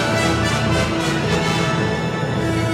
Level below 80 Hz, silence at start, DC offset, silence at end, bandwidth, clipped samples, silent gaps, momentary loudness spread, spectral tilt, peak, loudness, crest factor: -36 dBFS; 0 s; under 0.1%; 0 s; 15.5 kHz; under 0.1%; none; 3 LU; -5 dB/octave; -6 dBFS; -19 LUFS; 12 dB